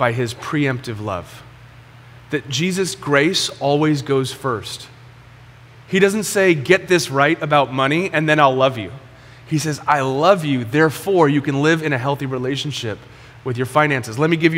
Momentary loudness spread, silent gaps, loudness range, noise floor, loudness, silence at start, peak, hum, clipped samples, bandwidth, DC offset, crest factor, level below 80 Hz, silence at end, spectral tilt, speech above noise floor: 11 LU; none; 4 LU; -43 dBFS; -18 LUFS; 0 s; 0 dBFS; none; under 0.1%; 16 kHz; under 0.1%; 18 dB; -54 dBFS; 0 s; -5 dB/octave; 25 dB